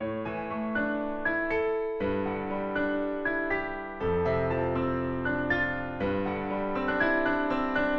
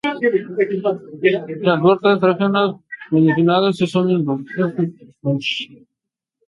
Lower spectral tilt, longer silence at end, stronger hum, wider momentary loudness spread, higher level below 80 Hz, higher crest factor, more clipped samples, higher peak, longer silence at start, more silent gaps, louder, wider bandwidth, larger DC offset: about the same, -8.5 dB/octave vs -7.5 dB/octave; second, 0 s vs 0.75 s; neither; second, 5 LU vs 9 LU; first, -48 dBFS vs -64 dBFS; about the same, 14 dB vs 16 dB; neither; second, -14 dBFS vs -2 dBFS; about the same, 0 s vs 0.05 s; neither; second, -29 LUFS vs -18 LUFS; second, 6.6 kHz vs 11 kHz; neither